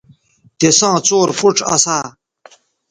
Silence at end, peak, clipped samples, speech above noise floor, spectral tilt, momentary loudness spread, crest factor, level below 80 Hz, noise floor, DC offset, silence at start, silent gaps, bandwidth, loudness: 0.8 s; 0 dBFS; under 0.1%; 37 dB; -2.5 dB/octave; 7 LU; 16 dB; -56 dBFS; -50 dBFS; under 0.1%; 0.6 s; none; 11 kHz; -13 LUFS